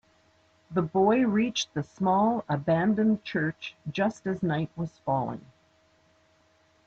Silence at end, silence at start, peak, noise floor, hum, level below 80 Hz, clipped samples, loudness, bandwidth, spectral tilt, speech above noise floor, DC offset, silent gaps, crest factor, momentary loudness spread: 1.45 s; 0.7 s; -12 dBFS; -65 dBFS; none; -64 dBFS; under 0.1%; -27 LUFS; 7.8 kHz; -6 dB/octave; 38 dB; under 0.1%; none; 18 dB; 11 LU